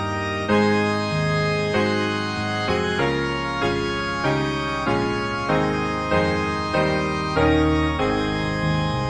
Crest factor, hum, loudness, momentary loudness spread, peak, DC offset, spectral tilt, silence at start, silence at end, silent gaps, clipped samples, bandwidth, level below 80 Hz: 14 dB; none; -22 LUFS; 5 LU; -6 dBFS; 0.4%; -6 dB/octave; 0 s; 0 s; none; under 0.1%; 10.5 kHz; -38 dBFS